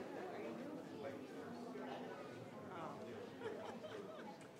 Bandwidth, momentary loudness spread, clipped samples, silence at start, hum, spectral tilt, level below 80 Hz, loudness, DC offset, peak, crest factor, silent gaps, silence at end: 16 kHz; 3 LU; under 0.1%; 0 s; none; -5.5 dB/octave; -88 dBFS; -51 LUFS; under 0.1%; -34 dBFS; 16 dB; none; 0 s